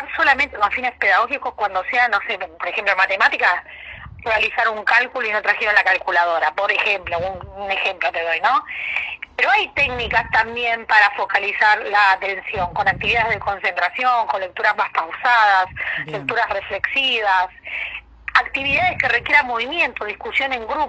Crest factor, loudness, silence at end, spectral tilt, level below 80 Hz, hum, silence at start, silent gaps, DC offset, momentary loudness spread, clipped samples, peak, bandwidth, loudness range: 18 dB; -18 LUFS; 0 s; -3.5 dB/octave; -48 dBFS; none; 0 s; none; under 0.1%; 9 LU; under 0.1%; 0 dBFS; 9.2 kHz; 3 LU